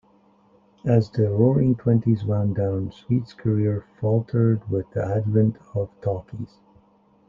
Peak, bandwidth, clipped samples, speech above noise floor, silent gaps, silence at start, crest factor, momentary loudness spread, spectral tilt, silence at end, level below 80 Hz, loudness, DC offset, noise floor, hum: -4 dBFS; 5.4 kHz; under 0.1%; 36 dB; none; 0.85 s; 18 dB; 10 LU; -11 dB/octave; 0.85 s; -54 dBFS; -23 LUFS; under 0.1%; -58 dBFS; none